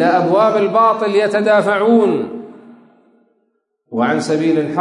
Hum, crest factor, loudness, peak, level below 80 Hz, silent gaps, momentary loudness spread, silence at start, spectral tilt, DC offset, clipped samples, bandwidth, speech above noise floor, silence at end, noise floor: none; 12 dB; -14 LUFS; -2 dBFS; -72 dBFS; none; 8 LU; 0 s; -6 dB/octave; under 0.1%; under 0.1%; 11 kHz; 53 dB; 0 s; -66 dBFS